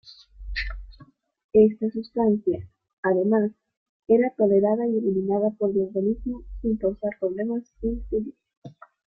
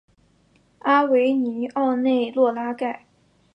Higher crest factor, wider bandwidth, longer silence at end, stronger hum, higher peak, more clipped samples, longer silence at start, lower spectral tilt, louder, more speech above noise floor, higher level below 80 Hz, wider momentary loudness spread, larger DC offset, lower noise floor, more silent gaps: about the same, 18 dB vs 16 dB; about the same, 5.8 kHz vs 5.8 kHz; second, 0.35 s vs 0.6 s; neither; about the same, -6 dBFS vs -6 dBFS; neither; second, 0.05 s vs 0.85 s; first, -9.5 dB/octave vs -6.5 dB/octave; second, -24 LUFS vs -21 LUFS; second, 31 dB vs 40 dB; first, -44 dBFS vs -70 dBFS; about the same, 12 LU vs 11 LU; neither; second, -54 dBFS vs -60 dBFS; first, 1.44-1.49 s, 2.93-3.03 s, 3.77-4.00 s, 8.57-8.62 s vs none